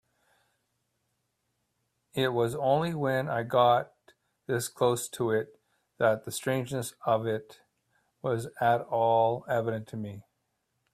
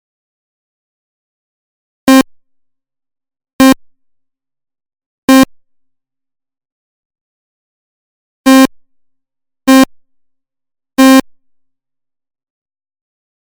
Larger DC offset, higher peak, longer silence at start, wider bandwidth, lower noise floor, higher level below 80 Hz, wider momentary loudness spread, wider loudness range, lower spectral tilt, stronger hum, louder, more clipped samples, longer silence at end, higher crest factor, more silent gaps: neither; second, -12 dBFS vs 0 dBFS; about the same, 2.15 s vs 2.05 s; second, 15.5 kHz vs over 20 kHz; first, -79 dBFS vs -71 dBFS; second, -68 dBFS vs -50 dBFS; about the same, 13 LU vs 11 LU; about the same, 3 LU vs 5 LU; first, -5 dB/octave vs -3 dB/octave; neither; second, -29 LUFS vs -9 LUFS; neither; second, 0.75 s vs 2.3 s; first, 20 dB vs 14 dB; second, none vs 3.53-3.59 s, 5.06-5.28 s, 6.72-7.10 s, 7.21-8.44 s